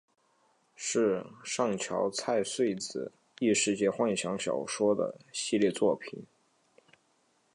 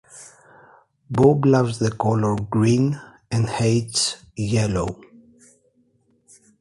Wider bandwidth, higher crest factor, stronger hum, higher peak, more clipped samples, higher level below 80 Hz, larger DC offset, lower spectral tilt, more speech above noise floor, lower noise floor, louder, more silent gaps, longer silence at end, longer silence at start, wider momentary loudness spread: about the same, 11.5 kHz vs 11.5 kHz; about the same, 18 dB vs 18 dB; neither; second, -14 dBFS vs -4 dBFS; neither; second, -74 dBFS vs -48 dBFS; neither; second, -3.5 dB/octave vs -6 dB/octave; about the same, 41 dB vs 43 dB; first, -71 dBFS vs -63 dBFS; second, -30 LUFS vs -21 LUFS; neither; second, 1.3 s vs 1.65 s; first, 0.8 s vs 0.15 s; second, 10 LU vs 13 LU